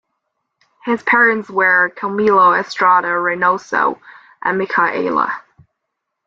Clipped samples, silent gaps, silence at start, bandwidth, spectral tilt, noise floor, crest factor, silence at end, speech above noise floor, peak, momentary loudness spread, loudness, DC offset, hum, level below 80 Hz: under 0.1%; none; 0.85 s; 7.6 kHz; -5.5 dB/octave; -76 dBFS; 16 dB; 0.9 s; 61 dB; -2 dBFS; 10 LU; -15 LUFS; under 0.1%; none; -64 dBFS